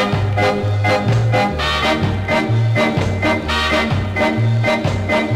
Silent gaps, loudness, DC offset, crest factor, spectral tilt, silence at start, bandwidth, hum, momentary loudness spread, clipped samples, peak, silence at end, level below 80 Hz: none; -16 LUFS; under 0.1%; 10 dB; -6 dB/octave; 0 s; 12.5 kHz; none; 2 LU; under 0.1%; -6 dBFS; 0 s; -34 dBFS